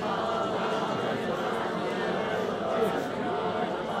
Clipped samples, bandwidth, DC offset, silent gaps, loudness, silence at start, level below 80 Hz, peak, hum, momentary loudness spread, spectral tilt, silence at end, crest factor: under 0.1%; 16 kHz; under 0.1%; none; -29 LUFS; 0 s; -62 dBFS; -16 dBFS; none; 2 LU; -5.5 dB/octave; 0 s; 14 dB